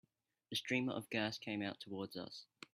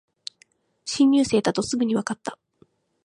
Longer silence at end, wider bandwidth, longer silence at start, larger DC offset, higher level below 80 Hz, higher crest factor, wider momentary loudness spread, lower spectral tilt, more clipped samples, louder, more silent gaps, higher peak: second, 0.1 s vs 0.7 s; first, 15.5 kHz vs 11 kHz; second, 0.5 s vs 0.85 s; neither; second, -82 dBFS vs -60 dBFS; about the same, 20 dB vs 18 dB; second, 10 LU vs 21 LU; about the same, -4.5 dB/octave vs -4.5 dB/octave; neither; second, -42 LUFS vs -22 LUFS; neither; second, -22 dBFS vs -6 dBFS